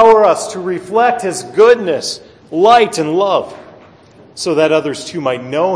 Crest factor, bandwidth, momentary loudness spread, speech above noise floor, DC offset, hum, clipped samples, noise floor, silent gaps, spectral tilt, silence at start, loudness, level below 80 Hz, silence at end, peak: 14 dB; 11 kHz; 12 LU; 30 dB; under 0.1%; none; under 0.1%; -42 dBFS; none; -4 dB/octave; 0 s; -13 LUFS; -54 dBFS; 0 s; 0 dBFS